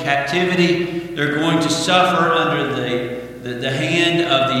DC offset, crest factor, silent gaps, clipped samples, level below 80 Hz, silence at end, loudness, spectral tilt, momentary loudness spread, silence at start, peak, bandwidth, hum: under 0.1%; 18 dB; none; under 0.1%; -52 dBFS; 0 s; -17 LUFS; -4.5 dB/octave; 9 LU; 0 s; 0 dBFS; 15.5 kHz; none